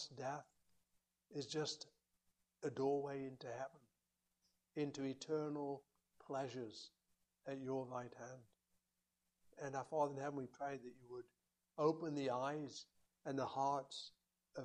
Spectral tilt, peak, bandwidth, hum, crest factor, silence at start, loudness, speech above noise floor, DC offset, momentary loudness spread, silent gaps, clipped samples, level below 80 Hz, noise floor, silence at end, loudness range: -5 dB/octave; -26 dBFS; 10.5 kHz; none; 22 dB; 0 s; -45 LUFS; 44 dB; under 0.1%; 16 LU; none; under 0.1%; -86 dBFS; -89 dBFS; 0 s; 6 LU